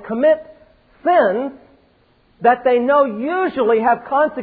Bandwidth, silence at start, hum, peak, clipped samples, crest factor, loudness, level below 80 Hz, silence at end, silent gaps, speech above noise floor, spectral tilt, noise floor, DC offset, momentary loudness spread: 4.7 kHz; 0 s; none; -2 dBFS; under 0.1%; 16 dB; -17 LUFS; -58 dBFS; 0 s; none; 40 dB; -9.5 dB/octave; -56 dBFS; under 0.1%; 7 LU